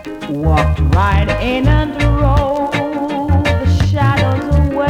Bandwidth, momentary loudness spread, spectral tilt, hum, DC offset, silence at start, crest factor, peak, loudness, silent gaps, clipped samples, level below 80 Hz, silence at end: 10.5 kHz; 5 LU; -7.5 dB/octave; none; under 0.1%; 0 s; 10 dB; -2 dBFS; -14 LUFS; none; under 0.1%; -20 dBFS; 0 s